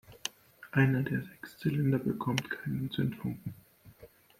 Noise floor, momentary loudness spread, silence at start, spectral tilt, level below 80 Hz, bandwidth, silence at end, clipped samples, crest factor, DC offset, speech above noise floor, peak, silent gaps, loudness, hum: -57 dBFS; 13 LU; 0.1 s; -6 dB/octave; -64 dBFS; 16 kHz; 0.35 s; under 0.1%; 22 dB; under 0.1%; 26 dB; -12 dBFS; none; -33 LUFS; none